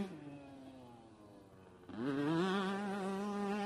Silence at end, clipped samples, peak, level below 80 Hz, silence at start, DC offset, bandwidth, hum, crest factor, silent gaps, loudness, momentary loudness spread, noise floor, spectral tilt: 0 s; under 0.1%; -22 dBFS; -76 dBFS; 0 s; under 0.1%; 12.5 kHz; none; 18 dB; none; -38 LUFS; 24 LU; -59 dBFS; -6.5 dB/octave